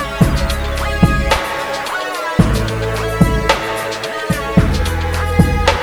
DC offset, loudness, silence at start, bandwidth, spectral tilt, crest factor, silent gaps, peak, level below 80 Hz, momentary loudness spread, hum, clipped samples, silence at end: under 0.1%; -16 LUFS; 0 s; over 20 kHz; -5.5 dB/octave; 16 dB; none; 0 dBFS; -22 dBFS; 6 LU; none; under 0.1%; 0 s